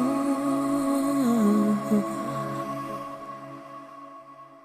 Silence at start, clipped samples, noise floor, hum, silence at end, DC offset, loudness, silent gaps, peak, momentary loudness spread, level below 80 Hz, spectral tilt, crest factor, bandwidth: 0 s; under 0.1%; -47 dBFS; none; 0.05 s; under 0.1%; -26 LUFS; none; -12 dBFS; 21 LU; -62 dBFS; -6.5 dB/octave; 14 dB; 14 kHz